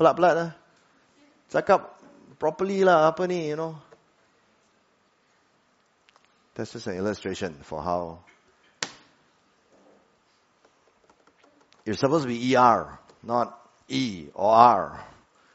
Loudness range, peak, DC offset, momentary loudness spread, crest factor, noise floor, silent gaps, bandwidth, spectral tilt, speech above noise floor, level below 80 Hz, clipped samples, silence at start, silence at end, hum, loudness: 20 LU; -2 dBFS; under 0.1%; 18 LU; 26 dB; -66 dBFS; none; 8 kHz; -4.5 dB/octave; 43 dB; -64 dBFS; under 0.1%; 0 s; 0.5 s; none; -24 LUFS